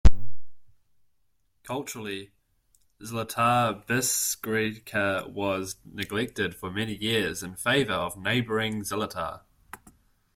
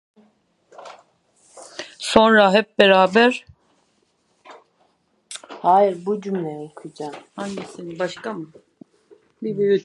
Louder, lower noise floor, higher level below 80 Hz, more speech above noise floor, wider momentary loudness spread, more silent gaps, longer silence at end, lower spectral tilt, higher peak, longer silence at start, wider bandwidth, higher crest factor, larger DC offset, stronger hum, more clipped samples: second, -28 LUFS vs -18 LUFS; first, -75 dBFS vs -65 dBFS; first, -36 dBFS vs -60 dBFS; about the same, 46 dB vs 46 dB; second, 13 LU vs 23 LU; neither; first, 0.6 s vs 0.05 s; about the same, -3.5 dB/octave vs -4.5 dB/octave; second, -4 dBFS vs 0 dBFS; second, 0.05 s vs 0.8 s; first, 16.5 kHz vs 11.5 kHz; about the same, 22 dB vs 22 dB; neither; neither; neither